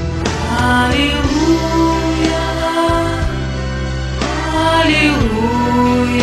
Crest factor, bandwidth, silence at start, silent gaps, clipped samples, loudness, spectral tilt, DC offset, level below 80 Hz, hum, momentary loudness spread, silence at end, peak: 14 dB; 14 kHz; 0 s; none; under 0.1%; -15 LUFS; -5.5 dB/octave; under 0.1%; -24 dBFS; none; 8 LU; 0 s; 0 dBFS